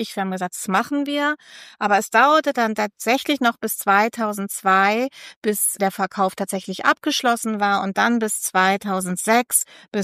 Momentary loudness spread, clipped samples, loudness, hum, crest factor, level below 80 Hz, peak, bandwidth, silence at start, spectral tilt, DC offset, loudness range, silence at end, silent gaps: 9 LU; under 0.1%; -20 LUFS; none; 18 dB; -72 dBFS; -2 dBFS; 15.5 kHz; 0 s; -3 dB/octave; under 0.1%; 2 LU; 0 s; 5.36-5.42 s